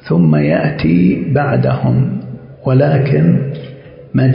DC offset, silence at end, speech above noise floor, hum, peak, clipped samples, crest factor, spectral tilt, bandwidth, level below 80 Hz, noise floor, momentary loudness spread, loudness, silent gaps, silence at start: under 0.1%; 0 s; 22 dB; none; -2 dBFS; under 0.1%; 12 dB; -14 dB/octave; 5.4 kHz; -40 dBFS; -33 dBFS; 12 LU; -13 LUFS; none; 0.05 s